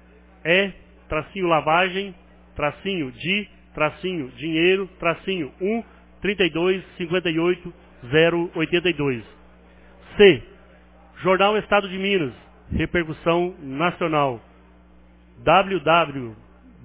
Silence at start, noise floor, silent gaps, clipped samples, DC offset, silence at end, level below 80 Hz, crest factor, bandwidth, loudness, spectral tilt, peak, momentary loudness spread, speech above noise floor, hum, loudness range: 0.45 s; -51 dBFS; none; under 0.1%; under 0.1%; 0.5 s; -46 dBFS; 20 dB; 4 kHz; -22 LUFS; -9.5 dB/octave; -2 dBFS; 11 LU; 29 dB; none; 3 LU